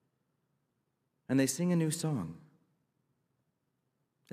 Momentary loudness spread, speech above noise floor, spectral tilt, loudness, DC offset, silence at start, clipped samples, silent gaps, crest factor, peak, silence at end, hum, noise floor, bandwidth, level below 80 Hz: 8 LU; 50 dB; -5.5 dB/octave; -32 LUFS; under 0.1%; 1.3 s; under 0.1%; none; 20 dB; -18 dBFS; 1.95 s; none; -81 dBFS; 15.5 kHz; -80 dBFS